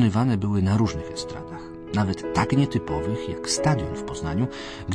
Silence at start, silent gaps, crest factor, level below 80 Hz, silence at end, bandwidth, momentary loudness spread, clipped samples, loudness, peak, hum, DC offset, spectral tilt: 0 s; none; 16 dB; -44 dBFS; 0 s; 10.5 kHz; 12 LU; under 0.1%; -25 LUFS; -8 dBFS; none; under 0.1%; -6 dB/octave